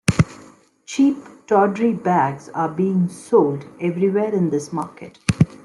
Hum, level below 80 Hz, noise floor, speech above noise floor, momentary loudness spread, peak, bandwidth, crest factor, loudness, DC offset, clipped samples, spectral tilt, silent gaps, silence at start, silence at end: none; -46 dBFS; -47 dBFS; 28 dB; 9 LU; 0 dBFS; 12 kHz; 20 dB; -20 LUFS; under 0.1%; under 0.1%; -7 dB/octave; none; 0.1 s; 0.2 s